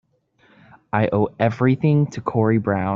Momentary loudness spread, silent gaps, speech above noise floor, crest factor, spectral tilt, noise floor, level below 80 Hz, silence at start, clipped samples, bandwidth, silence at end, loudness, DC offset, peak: 4 LU; none; 40 dB; 18 dB; -8 dB/octave; -59 dBFS; -56 dBFS; 0.95 s; under 0.1%; 7.4 kHz; 0 s; -20 LUFS; under 0.1%; -4 dBFS